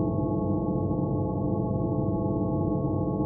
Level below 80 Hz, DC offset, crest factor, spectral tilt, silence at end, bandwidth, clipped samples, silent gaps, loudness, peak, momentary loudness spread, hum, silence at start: -42 dBFS; under 0.1%; 12 dB; -6.5 dB/octave; 0 s; 1.2 kHz; under 0.1%; none; -28 LUFS; -14 dBFS; 1 LU; none; 0 s